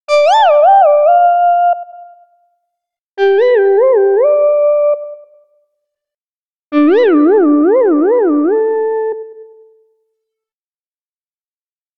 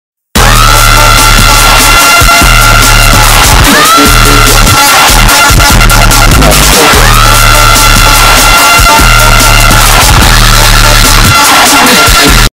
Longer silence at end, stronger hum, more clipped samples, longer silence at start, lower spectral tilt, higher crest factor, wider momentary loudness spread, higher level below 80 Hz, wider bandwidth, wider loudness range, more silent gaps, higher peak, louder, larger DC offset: first, 2.55 s vs 0.05 s; neither; second, under 0.1% vs 7%; second, 0.1 s vs 0.35 s; about the same, -3.5 dB/octave vs -2.5 dB/octave; first, 12 dB vs 2 dB; first, 10 LU vs 1 LU; second, -70 dBFS vs -8 dBFS; second, 7.6 kHz vs over 20 kHz; first, 5 LU vs 0 LU; first, 3.01-3.17 s, 6.17-6.70 s vs none; about the same, 0 dBFS vs 0 dBFS; second, -10 LUFS vs -1 LUFS; neither